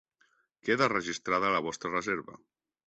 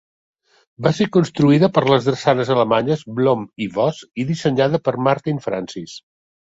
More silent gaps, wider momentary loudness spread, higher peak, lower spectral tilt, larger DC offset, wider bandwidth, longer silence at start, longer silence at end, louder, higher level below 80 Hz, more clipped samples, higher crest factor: neither; about the same, 9 LU vs 11 LU; second, -10 dBFS vs -2 dBFS; second, -4 dB/octave vs -7 dB/octave; neither; about the same, 8.2 kHz vs 8 kHz; second, 0.65 s vs 0.8 s; about the same, 0.5 s vs 0.5 s; second, -30 LUFS vs -18 LUFS; second, -68 dBFS vs -56 dBFS; neither; first, 22 dB vs 16 dB